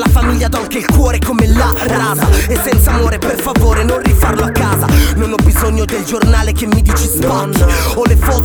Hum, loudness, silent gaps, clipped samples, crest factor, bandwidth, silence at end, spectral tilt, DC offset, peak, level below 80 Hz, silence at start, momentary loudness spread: none; -12 LUFS; none; under 0.1%; 10 dB; over 20 kHz; 0 s; -5.5 dB/octave; under 0.1%; 0 dBFS; -14 dBFS; 0 s; 3 LU